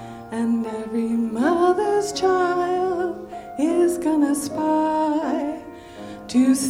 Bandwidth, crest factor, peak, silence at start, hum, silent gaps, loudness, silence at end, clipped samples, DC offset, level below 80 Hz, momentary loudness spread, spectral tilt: 16 kHz; 14 dB; -8 dBFS; 0 s; none; none; -22 LUFS; 0 s; under 0.1%; under 0.1%; -56 dBFS; 14 LU; -4.5 dB/octave